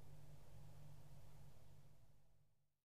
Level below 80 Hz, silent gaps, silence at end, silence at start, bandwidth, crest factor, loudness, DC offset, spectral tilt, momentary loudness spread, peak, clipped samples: -72 dBFS; none; 0 s; 0 s; 15 kHz; 12 dB; -65 LUFS; 0.2%; -6 dB/octave; 4 LU; -46 dBFS; under 0.1%